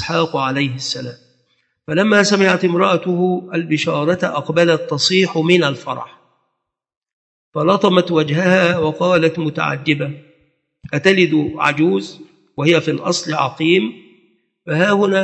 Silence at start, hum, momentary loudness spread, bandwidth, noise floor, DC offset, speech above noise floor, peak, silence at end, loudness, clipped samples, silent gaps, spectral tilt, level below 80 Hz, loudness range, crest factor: 0 s; none; 11 LU; 8.8 kHz; -76 dBFS; under 0.1%; 60 dB; 0 dBFS; 0 s; -16 LUFS; under 0.1%; 6.97-7.01 s, 7.13-7.52 s; -5 dB/octave; -58 dBFS; 2 LU; 16 dB